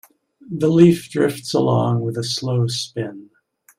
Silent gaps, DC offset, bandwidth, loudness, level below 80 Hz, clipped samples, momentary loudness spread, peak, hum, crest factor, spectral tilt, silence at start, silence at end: none; under 0.1%; 15.5 kHz; -19 LUFS; -58 dBFS; under 0.1%; 14 LU; -2 dBFS; none; 18 dB; -6.5 dB/octave; 0.45 s; 0.55 s